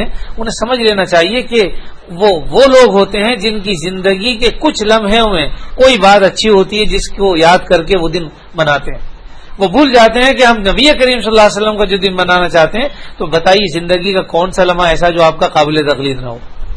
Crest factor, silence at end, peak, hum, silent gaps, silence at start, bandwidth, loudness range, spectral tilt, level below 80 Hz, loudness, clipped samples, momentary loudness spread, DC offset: 10 dB; 0 s; 0 dBFS; none; none; 0 s; 11 kHz; 2 LU; -4 dB/octave; -24 dBFS; -10 LUFS; 1%; 11 LU; under 0.1%